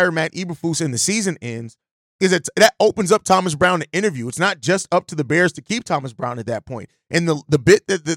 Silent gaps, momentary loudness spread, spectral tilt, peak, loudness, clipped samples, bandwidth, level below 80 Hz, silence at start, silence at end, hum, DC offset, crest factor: 1.91-2.19 s; 12 LU; -4 dB/octave; -2 dBFS; -18 LUFS; under 0.1%; 17 kHz; -54 dBFS; 0 s; 0 s; none; under 0.1%; 16 dB